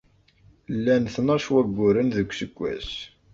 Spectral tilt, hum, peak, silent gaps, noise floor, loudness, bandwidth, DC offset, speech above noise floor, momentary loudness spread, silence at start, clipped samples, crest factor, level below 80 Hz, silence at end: -6.5 dB/octave; none; -8 dBFS; none; -57 dBFS; -24 LUFS; 7.6 kHz; under 0.1%; 34 dB; 11 LU; 0.7 s; under 0.1%; 16 dB; -50 dBFS; 0.25 s